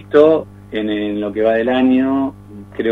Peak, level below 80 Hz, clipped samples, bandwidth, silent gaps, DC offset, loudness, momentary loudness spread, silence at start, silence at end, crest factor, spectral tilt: 0 dBFS; -50 dBFS; under 0.1%; 4.4 kHz; none; under 0.1%; -16 LUFS; 12 LU; 0 s; 0 s; 16 dB; -8 dB/octave